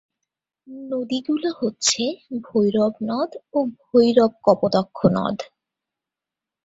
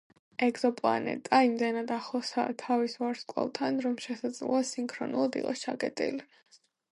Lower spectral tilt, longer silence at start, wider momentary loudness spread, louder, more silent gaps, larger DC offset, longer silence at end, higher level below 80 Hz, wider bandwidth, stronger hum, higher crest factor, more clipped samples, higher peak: about the same, -4.5 dB/octave vs -4 dB/octave; first, 0.7 s vs 0.4 s; first, 11 LU vs 8 LU; first, -21 LUFS vs -31 LUFS; neither; neither; first, 1.2 s vs 0.7 s; first, -60 dBFS vs -80 dBFS; second, 8 kHz vs 11.5 kHz; neither; about the same, 20 dB vs 20 dB; neither; first, -2 dBFS vs -10 dBFS